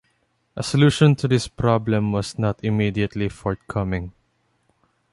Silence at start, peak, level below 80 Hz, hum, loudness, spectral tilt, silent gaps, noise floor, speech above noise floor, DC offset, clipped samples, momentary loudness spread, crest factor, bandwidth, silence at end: 0.55 s; -4 dBFS; -44 dBFS; none; -21 LUFS; -6.5 dB/octave; none; -67 dBFS; 47 dB; under 0.1%; under 0.1%; 12 LU; 18 dB; 11.5 kHz; 1 s